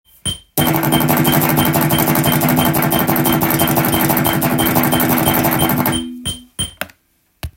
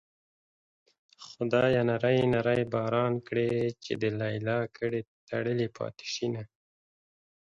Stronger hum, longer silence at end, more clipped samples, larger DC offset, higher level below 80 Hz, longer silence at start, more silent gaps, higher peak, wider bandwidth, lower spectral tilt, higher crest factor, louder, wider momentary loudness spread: neither; second, 0.05 s vs 1.1 s; neither; neither; first, -40 dBFS vs -62 dBFS; second, 0.25 s vs 1.2 s; second, none vs 5.07-5.27 s; first, 0 dBFS vs -12 dBFS; first, 17 kHz vs 7.8 kHz; second, -4.5 dB/octave vs -6.5 dB/octave; about the same, 16 dB vs 18 dB; first, -15 LUFS vs -29 LUFS; about the same, 10 LU vs 11 LU